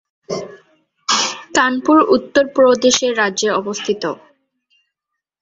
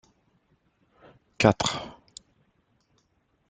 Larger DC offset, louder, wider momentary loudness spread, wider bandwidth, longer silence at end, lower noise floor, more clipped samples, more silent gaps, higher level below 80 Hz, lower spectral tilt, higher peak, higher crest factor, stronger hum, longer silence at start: neither; first, -15 LUFS vs -25 LUFS; second, 15 LU vs 27 LU; second, 8 kHz vs 9.6 kHz; second, 1.25 s vs 1.6 s; first, -80 dBFS vs -71 dBFS; neither; neither; about the same, -58 dBFS vs -56 dBFS; second, -2.5 dB/octave vs -4.5 dB/octave; about the same, -2 dBFS vs -2 dBFS; second, 16 dB vs 28 dB; neither; second, 0.3 s vs 1.4 s